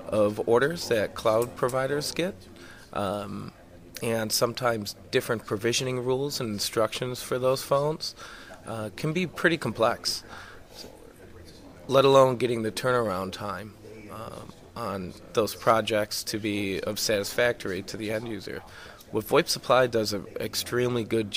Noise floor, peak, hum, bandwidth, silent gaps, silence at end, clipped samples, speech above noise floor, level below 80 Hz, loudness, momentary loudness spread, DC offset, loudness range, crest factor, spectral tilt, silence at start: -48 dBFS; -6 dBFS; none; 16 kHz; none; 0 s; under 0.1%; 21 dB; -58 dBFS; -27 LUFS; 19 LU; under 0.1%; 4 LU; 22 dB; -4 dB/octave; 0 s